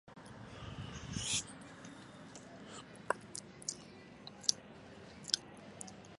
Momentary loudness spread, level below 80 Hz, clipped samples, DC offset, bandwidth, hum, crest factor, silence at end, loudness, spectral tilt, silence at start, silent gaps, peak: 18 LU; -64 dBFS; under 0.1%; under 0.1%; 11.5 kHz; none; 38 dB; 0 s; -41 LUFS; -2 dB/octave; 0.05 s; none; -6 dBFS